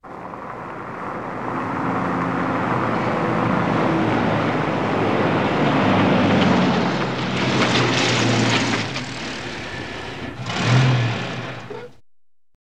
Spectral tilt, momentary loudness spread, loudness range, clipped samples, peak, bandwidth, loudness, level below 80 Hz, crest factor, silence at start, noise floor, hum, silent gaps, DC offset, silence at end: -5.5 dB/octave; 14 LU; 6 LU; under 0.1%; -6 dBFS; 10 kHz; -20 LUFS; -50 dBFS; 14 dB; 0 s; -60 dBFS; none; none; 0.6%; 0.75 s